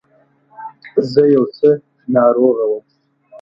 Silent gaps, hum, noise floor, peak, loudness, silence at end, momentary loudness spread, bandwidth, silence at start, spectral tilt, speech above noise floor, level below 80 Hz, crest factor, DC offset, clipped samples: none; none; -55 dBFS; 0 dBFS; -15 LUFS; 0.05 s; 18 LU; 6 kHz; 0.6 s; -8.5 dB/octave; 42 dB; -60 dBFS; 16 dB; under 0.1%; under 0.1%